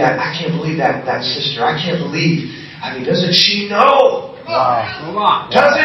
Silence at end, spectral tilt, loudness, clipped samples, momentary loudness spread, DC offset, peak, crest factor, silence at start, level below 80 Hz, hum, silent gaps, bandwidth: 0 s; -5 dB/octave; -14 LUFS; under 0.1%; 11 LU; under 0.1%; 0 dBFS; 14 dB; 0 s; -54 dBFS; none; none; 13.5 kHz